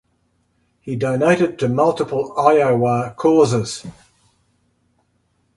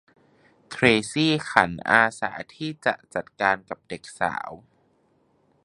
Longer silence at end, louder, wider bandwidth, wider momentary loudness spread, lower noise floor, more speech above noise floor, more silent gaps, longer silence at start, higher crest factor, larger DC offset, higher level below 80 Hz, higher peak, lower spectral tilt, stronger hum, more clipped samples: first, 1.65 s vs 1.05 s; first, -17 LUFS vs -23 LUFS; about the same, 11.5 kHz vs 11.5 kHz; second, 14 LU vs 17 LU; about the same, -65 dBFS vs -65 dBFS; first, 48 dB vs 41 dB; neither; first, 0.85 s vs 0.7 s; second, 18 dB vs 26 dB; neither; about the same, -56 dBFS vs -58 dBFS; about the same, 0 dBFS vs 0 dBFS; first, -6.5 dB/octave vs -4.5 dB/octave; neither; neither